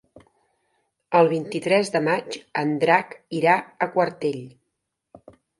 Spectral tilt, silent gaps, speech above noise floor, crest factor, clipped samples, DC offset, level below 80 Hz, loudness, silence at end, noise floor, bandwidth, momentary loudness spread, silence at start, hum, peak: -5.5 dB/octave; none; 57 dB; 20 dB; under 0.1%; under 0.1%; -70 dBFS; -22 LUFS; 1.1 s; -79 dBFS; 11.5 kHz; 9 LU; 1.1 s; none; -4 dBFS